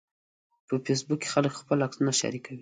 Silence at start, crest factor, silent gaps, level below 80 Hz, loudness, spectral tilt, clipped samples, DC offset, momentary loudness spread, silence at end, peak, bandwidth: 0.7 s; 20 dB; none; -72 dBFS; -28 LUFS; -4.5 dB/octave; under 0.1%; under 0.1%; 7 LU; 0 s; -10 dBFS; 9.6 kHz